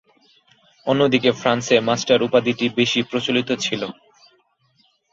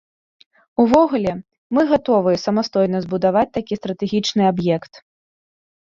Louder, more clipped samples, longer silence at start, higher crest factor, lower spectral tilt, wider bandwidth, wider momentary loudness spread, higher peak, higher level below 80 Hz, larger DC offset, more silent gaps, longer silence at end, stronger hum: about the same, -19 LUFS vs -18 LUFS; neither; about the same, 0.85 s vs 0.8 s; about the same, 20 dB vs 20 dB; second, -4.5 dB/octave vs -6.5 dB/octave; about the same, 7.8 kHz vs 7.6 kHz; about the same, 7 LU vs 9 LU; about the same, -2 dBFS vs 0 dBFS; second, -60 dBFS vs -54 dBFS; neither; second, none vs 1.58-1.70 s; first, 1.2 s vs 0.95 s; neither